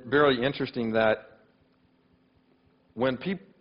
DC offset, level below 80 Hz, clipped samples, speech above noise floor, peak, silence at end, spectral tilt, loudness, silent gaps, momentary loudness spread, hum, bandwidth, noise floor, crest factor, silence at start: under 0.1%; -62 dBFS; under 0.1%; 39 dB; -8 dBFS; 0.2 s; -9 dB/octave; -27 LUFS; none; 11 LU; none; 5.4 kHz; -65 dBFS; 20 dB; 0.05 s